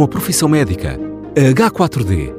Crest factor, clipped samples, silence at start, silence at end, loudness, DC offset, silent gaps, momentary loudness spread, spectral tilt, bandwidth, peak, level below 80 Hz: 12 dB; under 0.1%; 0 s; 0 s; -14 LUFS; under 0.1%; none; 10 LU; -5.5 dB/octave; 16 kHz; -2 dBFS; -32 dBFS